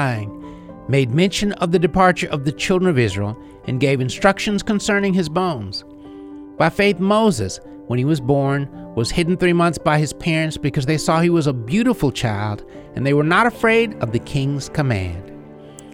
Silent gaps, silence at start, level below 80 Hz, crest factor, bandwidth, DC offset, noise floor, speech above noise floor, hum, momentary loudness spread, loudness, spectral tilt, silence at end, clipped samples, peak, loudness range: none; 0 s; -42 dBFS; 18 dB; 16 kHz; under 0.1%; -39 dBFS; 21 dB; none; 16 LU; -18 LUFS; -6 dB/octave; 0 s; under 0.1%; -2 dBFS; 2 LU